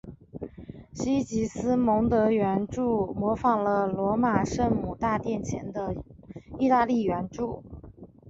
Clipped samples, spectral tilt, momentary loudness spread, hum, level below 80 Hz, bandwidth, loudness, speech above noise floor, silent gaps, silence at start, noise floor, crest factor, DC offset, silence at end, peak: under 0.1%; -7 dB/octave; 19 LU; none; -48 dBFS; 7.8 kHz; -26 LUFS; 22 dB; none; 0.05 s; -48 dBFS; 18 dB; under 0.1%; 0 s; -10 dBFS